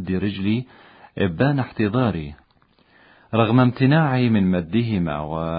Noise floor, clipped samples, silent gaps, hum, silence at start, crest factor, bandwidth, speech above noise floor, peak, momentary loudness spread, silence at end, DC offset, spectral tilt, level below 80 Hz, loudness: -59 dBFS; under 0.1%; none; none; 0 s; 18 dB; 5.2 kHz; 39 dB; -2 dBFS; 9 LU; 0 s; under 0.1%; -12.5 dB/octave; -44 dBFS; -21 LUFS